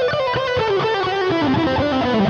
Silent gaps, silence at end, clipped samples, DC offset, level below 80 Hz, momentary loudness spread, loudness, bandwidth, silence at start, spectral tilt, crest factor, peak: none; 0 s; under 0.1%; under 0.1%; -44 dBFS; 2 LU; -19 LUFS; 8.4 kHz; 0 s; -6.5 dB/octave; 10 dB; -8 dBFS